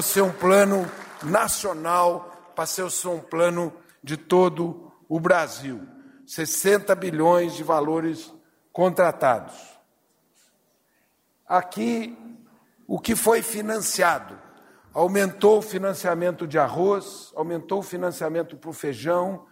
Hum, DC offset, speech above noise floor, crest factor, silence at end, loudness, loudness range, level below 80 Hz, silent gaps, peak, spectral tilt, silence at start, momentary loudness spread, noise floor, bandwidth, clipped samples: none; under 0.1%; 44 dB; 18 dB; 0.1 s; -23 LUFS; 4 LU; -62 dBFS; none; -6 dBFS; -4 dB/octave; 0 s; 15 LU; -67 dBFS; 16 kHz; under 0.1%